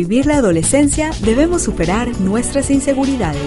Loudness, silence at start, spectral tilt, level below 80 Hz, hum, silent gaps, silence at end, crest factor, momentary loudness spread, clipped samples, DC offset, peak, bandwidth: -15 LUFS; 0 s; -5 dB/octave; -28 dBFS; none; none; 0 s; 14 dB; 4 LU; under 0.1%; under 0.1%; 0 dBFS; 11.5 kHz